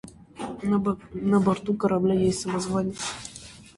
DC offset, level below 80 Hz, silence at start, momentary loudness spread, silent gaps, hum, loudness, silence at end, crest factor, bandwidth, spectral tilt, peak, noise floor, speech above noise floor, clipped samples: under 0.1%; -52 dBFS; 0.05 s; 16 LU; none; none; -25 LUFS; 0.15 s; 16 dB; 11.5 kHz; -6 dB/octave; -10 dBFS; -45 dBFS; 21 dB; under 0.1%